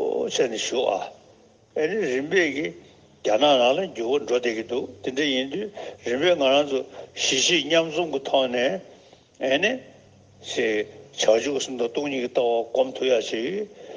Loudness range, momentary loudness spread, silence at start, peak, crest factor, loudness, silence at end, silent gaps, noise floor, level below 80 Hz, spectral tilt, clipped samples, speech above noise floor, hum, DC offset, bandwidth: 3 LU; 11 LU; 0 s; -6 dBFS; 18 dB; -23 LUFS; 0 s; none; -55 dBFS; -72 dBFS; -2.5 dB/octave; under 0.1%; 31 dB; none; under 0.1%; 10 kHz